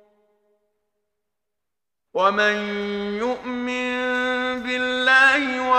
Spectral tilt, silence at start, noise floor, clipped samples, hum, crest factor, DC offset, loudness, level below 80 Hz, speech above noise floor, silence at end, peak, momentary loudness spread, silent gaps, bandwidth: -3.5 dB/octave; 2.15 s; -87 dBFS; under 0.1%; none; 18 dB; under 0.1%; -20 LUFS; -60 dBFS; 64 dB; 0 s; -4 dBFS; 12 LU; none; 11 kHz